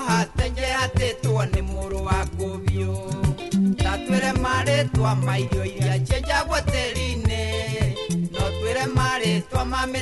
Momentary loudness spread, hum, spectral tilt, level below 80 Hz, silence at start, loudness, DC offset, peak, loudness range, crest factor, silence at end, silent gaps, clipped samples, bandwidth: 5 LU; none; -5.5 dB/octave; -32 dBFS; 0 s; -23 LUFS; under 0.1%; -6 dBFS; 2 LU; 18 dB; 0 s; none; under 0.1%; 12 kHz